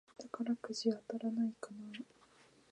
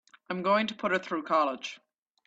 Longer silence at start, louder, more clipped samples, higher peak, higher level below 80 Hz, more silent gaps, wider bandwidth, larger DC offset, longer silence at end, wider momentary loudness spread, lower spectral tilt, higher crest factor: about the same, 0.2 s vs 0.3 s; second, -40 LUFS vs -29 LUFS; neither; second, -22 dBFS vs -12 dBFS; second, -86 dBFS vs -76 dBFS; neither; first, 10.5 kHz vs 8 kHz; neither; first, 0.65 s vs 0.5 s; about the same, 13 LU vs 11 LU; about the same, -5 dB/octave vs -5 dB/octave; about the same, 20 dB vs 18 dB